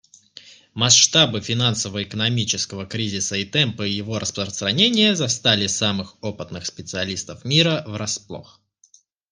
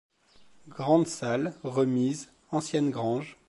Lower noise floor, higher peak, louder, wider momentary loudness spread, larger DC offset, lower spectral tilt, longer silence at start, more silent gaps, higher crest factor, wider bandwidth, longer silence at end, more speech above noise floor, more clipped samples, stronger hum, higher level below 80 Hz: about the same, -57 dBFS vs -58 dBFS; first, 0 dBFS vs -10 dBFS; first, -19 LUFS vs -28 LUFS; first, 15 LU vs 9 LU; neither; second, -3 dB/octave vs -6 dB/octave; second, 0.35 s vs 0.65 s; neither; about the same, 22 dB vs 20 dB; about the same, 10.5 kHz vs 11.5 kHz; first, 0.9 s vs 0.15 s; first, 35 dB vs 30 dB; neither; neither; first, -60 dBFS vs -70 dBFS